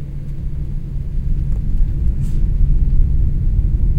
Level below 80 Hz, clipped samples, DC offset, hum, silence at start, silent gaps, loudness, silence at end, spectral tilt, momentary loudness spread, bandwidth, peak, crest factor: -16 dBFS; under 0.1%; under 0.1%; none; 0 s; none; -21 LUFS; 0 s; -10 dB/octave; 8 LU; 2 kHz; -2 dBFS; 14 dB